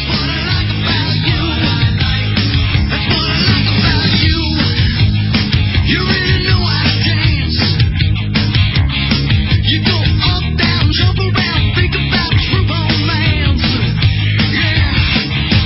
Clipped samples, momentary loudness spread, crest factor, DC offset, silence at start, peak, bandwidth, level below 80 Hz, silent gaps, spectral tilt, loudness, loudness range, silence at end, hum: under 0.1%; 2 LU; 12 dB; under 0.1%; 0 s; 0 dBFS; 5.8 kHz; -20 dBFS; none; -9 dB/octave; -13 LUFS; 1 LU; 0 s; none